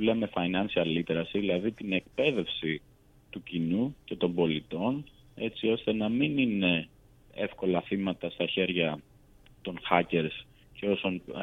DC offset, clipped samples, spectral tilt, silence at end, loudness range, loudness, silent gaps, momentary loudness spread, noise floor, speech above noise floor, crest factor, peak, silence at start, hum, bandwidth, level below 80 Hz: under 0.1%; under 0.1%; -7.5 dB/octave; 0 s; 2 LU; -30 LUFS; none; 11 LU; -57 dBFS; 28 dB; 24 dB; -6 dBFS; 0 s; none; 6.8 kHz; -60 dBFS